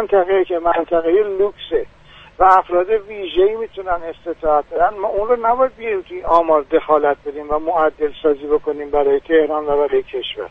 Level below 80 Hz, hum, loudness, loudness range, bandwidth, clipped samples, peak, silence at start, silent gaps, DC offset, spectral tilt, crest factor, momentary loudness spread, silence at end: -42 dBFS; none; -17 LUFS; 1 LU; 5.6 kHz; under 0.1%; 0 dBFS; 0 s; none; under 0.1%; -6.5 dB/octave; 16 dB; 9 LU; 0.05 s